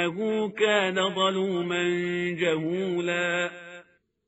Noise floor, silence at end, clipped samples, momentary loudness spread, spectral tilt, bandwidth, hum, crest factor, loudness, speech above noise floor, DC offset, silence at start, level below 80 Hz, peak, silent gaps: -55 dBFS; 0.45 s; under 0.1%; 5 LU; -3 dB/octave; 8 kHz; none; 18 dB; -26 LUFS; 29 dB; under 0.1%; 0 s; -72 dBFS; -10 dBFS; none